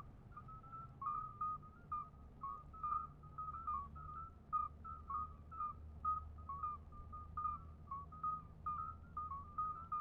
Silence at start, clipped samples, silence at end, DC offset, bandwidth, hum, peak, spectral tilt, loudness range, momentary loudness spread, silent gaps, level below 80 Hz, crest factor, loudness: 0 s; under 0.1%; 0 s; under 0.1%; 4.5 kHz; none; -30 dBFS; -8 dB/octave; 1 LU; 10 LU; none; -60 dBFS; 16 dB; -47 LUFS